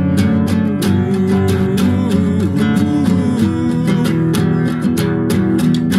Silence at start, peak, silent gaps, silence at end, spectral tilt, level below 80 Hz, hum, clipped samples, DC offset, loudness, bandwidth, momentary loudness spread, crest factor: 0 s; -2 dBFS; none; 0 s; -7 dB/octave; -46 dBFS; none; under 0.1%; under 0.1%; -15 LUFS; 15 kHz; 2 LU; 12 dB